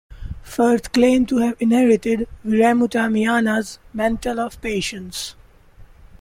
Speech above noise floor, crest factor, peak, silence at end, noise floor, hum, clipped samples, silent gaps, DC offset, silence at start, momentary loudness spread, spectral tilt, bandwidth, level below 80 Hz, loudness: 27 dB; 16 dB; -4 dBFS; 0.35 s; -45 dBFS; none; under 0.1%; none; under 0.1%; 0.1 s; 14 LU; -5 dB/octave; 16 kHz; -42 dBFS; -19 LUFS